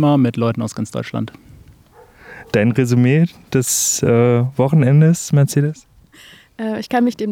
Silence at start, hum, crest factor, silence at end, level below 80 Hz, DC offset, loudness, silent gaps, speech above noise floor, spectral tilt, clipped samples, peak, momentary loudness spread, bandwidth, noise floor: 0 s; none; 14 dB; 0 s; -54 dBFS; under 0.1%; -16 LUFS; none; 31 dB; -6 dB/octave; under 0.1%; -2 dBFS; 12 LU; 16.5 kHz; -46 dBFS